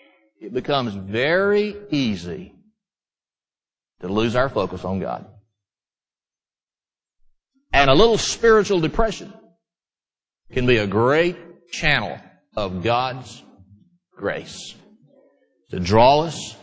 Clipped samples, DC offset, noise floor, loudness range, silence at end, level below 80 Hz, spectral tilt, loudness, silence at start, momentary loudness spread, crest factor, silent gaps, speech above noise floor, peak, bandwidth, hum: under 0.1%; under 0.1%; under -90 dBFS; 9 LU; 0.1 s; -40 dBFS; -5 dB/octave; -20 LUFS; 0.4 s; 19 LU; 22 dB; none; over 70 dB; 0 dBFS; 8 kHz; none